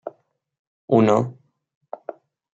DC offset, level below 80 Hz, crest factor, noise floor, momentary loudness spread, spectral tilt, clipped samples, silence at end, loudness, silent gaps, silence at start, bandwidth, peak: under 0.1%; -66 dBFS; 20 dB; -59 dBFS; 22 LU; -8 dB/octave; under 0.1%; 1.2 s; -19 LUFS; 0.59-0.88 s; 0.05 s; 7.8 kHz; -4 dBFS